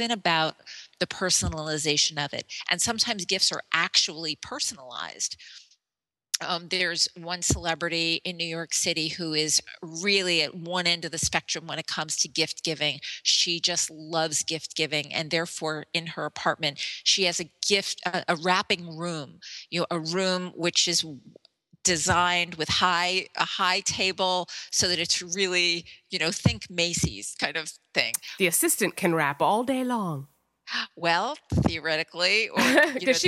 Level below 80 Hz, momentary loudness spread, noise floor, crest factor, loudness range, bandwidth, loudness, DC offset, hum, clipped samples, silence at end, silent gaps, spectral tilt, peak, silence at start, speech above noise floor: -52 dBFS; 9 LU; under -90 dBFS; 24 dB; 3 LU; 16.5 kHz; -25 LUFS; under 0.1%; none; under 0.1%; 0 s; none; -2 dB/octave; -4 dBFS; 0 s; over 63 dB